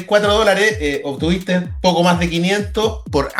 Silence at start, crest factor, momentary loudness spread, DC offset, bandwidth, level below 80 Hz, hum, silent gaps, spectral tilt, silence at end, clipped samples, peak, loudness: 0 s; 16 dB; 7 LU; under 0.1%; 14.5 kHz; -32 dBFS; none; none; -5 dB/octave; 0 s; under 0.1%; 0 dBFS; -16 LUFS